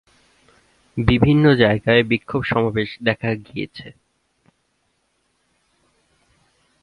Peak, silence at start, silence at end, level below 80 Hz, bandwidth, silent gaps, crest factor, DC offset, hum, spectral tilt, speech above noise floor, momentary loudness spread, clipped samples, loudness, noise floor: 0 dBFS; 0.95 s; 2.9 s; -40 dBFS; 10.5 kHz; none; 20 dB; under 0.1%; none; -8.5 dB/octave; 50 dB; 16 LU; under 0.1%; -18 LUFS; -68 dBFS